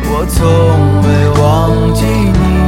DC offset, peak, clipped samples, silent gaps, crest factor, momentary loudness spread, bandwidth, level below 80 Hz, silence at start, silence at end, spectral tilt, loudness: under 0.1%; 0 dBFS; under 0.1%; none; 8 dB; 3 LU; 16 kHz; -18 dBFS; 0 s; 0 s; -7 dB/octave; -10 LUFS